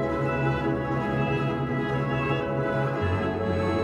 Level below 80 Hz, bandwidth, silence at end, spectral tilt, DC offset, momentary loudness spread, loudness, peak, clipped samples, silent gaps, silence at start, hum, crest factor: -46 dBFS; 9.4 kHz; 0 s; -8 dB/octave; under 0.1%; 1 LU; -26 LUFS; -14 dBFS; under 0.1%; none; 0 s; none; 12 dB